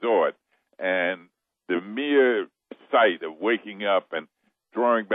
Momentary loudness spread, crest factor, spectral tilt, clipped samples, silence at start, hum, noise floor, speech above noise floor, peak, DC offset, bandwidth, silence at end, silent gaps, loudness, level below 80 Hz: 14 LU; 16 dB; -8 dB/octave; under 0.1%; 0 s; none; -58 dBFS; 32 dB; -8 dBFS; under 0.1%; 3.9 kHz; 0 s; none; -24 LUFS; -84 dBFS